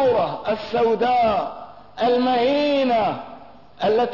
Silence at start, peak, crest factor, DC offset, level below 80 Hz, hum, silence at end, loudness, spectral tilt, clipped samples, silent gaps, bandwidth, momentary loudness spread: 0 s; -10 dBFS; 10 dB; 0.4%; -54 dBFS; none; 0 s; -20 LUFS; -6.5 dB/octave; under 0.1%; none; 6 kHz; 14 LU